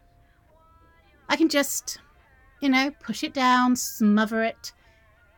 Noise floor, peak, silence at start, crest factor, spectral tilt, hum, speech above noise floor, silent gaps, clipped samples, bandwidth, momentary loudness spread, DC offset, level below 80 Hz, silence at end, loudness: -58 dBFS; -6 dBFS; 1.3 s; 20 dB; -3.5 dB/octave; none; 35 dB; none; under 0.1%; 17.5 kHz; 14 LU; under 0.1%; -60 dBFS; 0.7 s; -23 LUFS